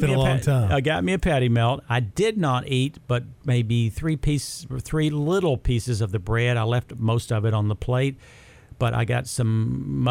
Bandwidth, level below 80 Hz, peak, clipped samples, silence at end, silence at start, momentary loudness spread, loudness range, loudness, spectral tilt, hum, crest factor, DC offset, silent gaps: 14.5 kHz; -38 dBFS; -8 dBFS; under 0.1%; 0 s; 0 s; 6 LU; 2 LU; -23 LUFS; -6.5 dB/octave; none; 14 dB; under 0.1%; none